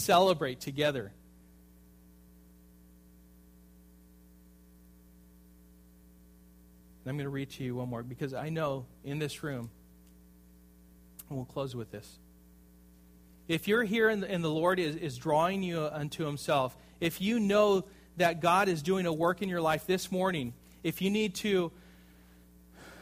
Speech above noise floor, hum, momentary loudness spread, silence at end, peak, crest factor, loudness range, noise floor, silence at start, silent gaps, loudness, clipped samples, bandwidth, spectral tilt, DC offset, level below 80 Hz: 27 dB; 60 Hz at -60 dBFS; 15 LU; 0 s; -12 dBFS; 22 dB; 15 LU; -58 dBFS; 0 s; none; -31 LUFS; under 0.1%; 15.5 kHz; -5.5 dB/octave; under 0.1%; -62 dBFS